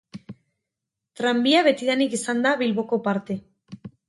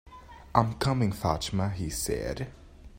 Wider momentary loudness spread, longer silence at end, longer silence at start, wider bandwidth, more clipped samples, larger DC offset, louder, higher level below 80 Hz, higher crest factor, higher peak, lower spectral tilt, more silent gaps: first, 24 LU vs 13 LU; first, 0.2 s vs 0 s; about the same, 0.15 s vs 0.05 s; second, 11.5 kHz vs 16.5 kHz; neither; neither; first, -22 LUFS vs -29 LUFS; second, -70 dBFS vs -46 dBFS; second, 18 dB vs 26 dB; about the same, -6 dBFS vs -4 dBFS; second, -4 dB/octave vs -5.5 dB/octave; neither